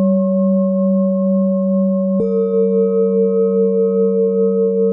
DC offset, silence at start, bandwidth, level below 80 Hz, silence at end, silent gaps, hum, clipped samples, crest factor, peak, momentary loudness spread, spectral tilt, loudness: under 0.1%; 0 s; 2.4 kHz; -64 dBFS; 0 s; none; none; under 0.1%; 8 dB; -6 dBFS; 1 LU; -15 dB/octave; -15 LUFS